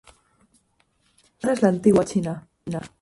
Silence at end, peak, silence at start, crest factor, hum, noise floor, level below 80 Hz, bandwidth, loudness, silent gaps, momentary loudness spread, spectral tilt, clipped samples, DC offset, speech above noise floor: 0.15 s; -4 dBFS; 1.45 s; 20 dB; none; -66 dBFS; -56 dBFS; 11.5 kHz; -22 LUFS; none; 14 LU; -7 dB/octave; under 0.1%; under 0.1%; 45 dB